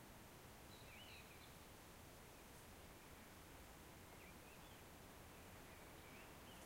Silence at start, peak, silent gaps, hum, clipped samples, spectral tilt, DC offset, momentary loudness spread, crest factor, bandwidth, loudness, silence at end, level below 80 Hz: 0 s; -46 dBFS; none; none; under 0.1%; -3.5 dB/octave; under 0.1%; 2 LU; 14 dB; 16 kHz; -60 LUFS; 0 s; -70 dBFS